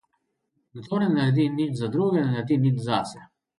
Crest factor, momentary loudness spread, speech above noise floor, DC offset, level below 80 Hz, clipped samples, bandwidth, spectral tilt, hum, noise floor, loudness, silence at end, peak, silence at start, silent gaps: 16 dB; 7 LU; 52 dB; under 0.1%; -64 dBFS; under 0.1%; 11.5 kHz; -7.5 dB/octave; none; -75 dBFS; -24 LUFS; 0.35 s; -8 dBFS; 0.75 s; none